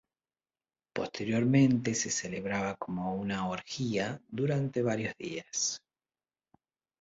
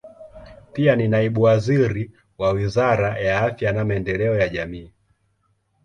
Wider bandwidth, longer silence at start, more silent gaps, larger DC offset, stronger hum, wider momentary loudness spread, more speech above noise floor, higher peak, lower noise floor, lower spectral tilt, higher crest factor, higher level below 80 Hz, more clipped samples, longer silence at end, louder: about the same, 8 kHz vs 8.8 kHz; first, 0.95 s vs 0.05 s; neither; neither; neither; about the same, 11 LU vs 12 LU; first, over 59 dB vs 47 dB; second, -14 dBFS vs -4 dBFS; first, under -90 dBFS vs -67 dBFS; second, -5 dB/octave vs -7.5 dB/octave; about the same, 18 dB vs 18 dB; second, -66 dBFS vs -44 dBFS; neither; first, 1.25 s vs 0.95 s; second, -32 LUFS vs -20 LUFS